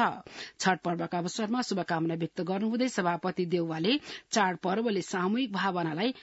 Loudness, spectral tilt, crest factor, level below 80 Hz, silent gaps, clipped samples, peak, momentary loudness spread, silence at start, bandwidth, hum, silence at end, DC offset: -30 LUFS; -5 dB/octave; 20 dB; -74 dBFS; none; under 0.1%; -10 dBFS; 4 LU; 0 s; 8 kHz; none; 0 s; under 0.1%